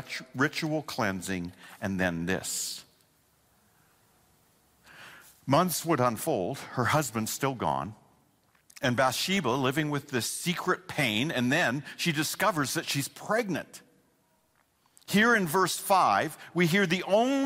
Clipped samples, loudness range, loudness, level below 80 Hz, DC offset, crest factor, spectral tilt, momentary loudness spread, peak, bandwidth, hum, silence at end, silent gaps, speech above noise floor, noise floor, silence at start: under 0.1%; 7 LU; -28 LUFS; -64 dBFS; under 0.1%; 18 dB; -4 dB/octave; 11 LU; -12 dBFS; 16 kHz; none; 0 s; none; 41 dB; -69 dBFS; 0 s